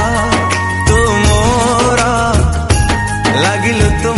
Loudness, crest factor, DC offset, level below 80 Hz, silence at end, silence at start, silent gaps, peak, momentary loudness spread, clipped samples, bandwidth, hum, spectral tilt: -12 LUFS; 12 dB; under 0.1%; -20 dBFS; 0 s; 0 s; none; 0 dBFS; 3 LU; under 0.1%; 11.5 kHz; none; -4.5 dB/octave